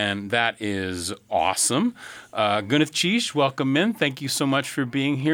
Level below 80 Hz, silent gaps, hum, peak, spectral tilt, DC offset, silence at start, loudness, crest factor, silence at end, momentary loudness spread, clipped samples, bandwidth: -62 dBFS; none; none; -6 dBFS; -3.5 dB/octave; under 0.1%; 0 s; -23 LUFS; 18 dB; 0 s; 7 LU; under 0.1%; 19 kHz